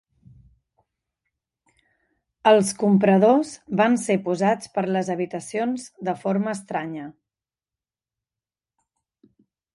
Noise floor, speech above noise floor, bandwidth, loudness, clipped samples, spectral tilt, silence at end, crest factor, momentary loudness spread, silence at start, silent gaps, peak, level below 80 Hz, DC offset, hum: under -90 dBFS; over 69 dB; 11.5 kHz; -22 LUFS; under 0.1%; -6 dB/octave; 2.65 s; 20 dB; 12 LU; 2.45 s; none; -4 dBFS; -68 dBFS; under 0.1%; none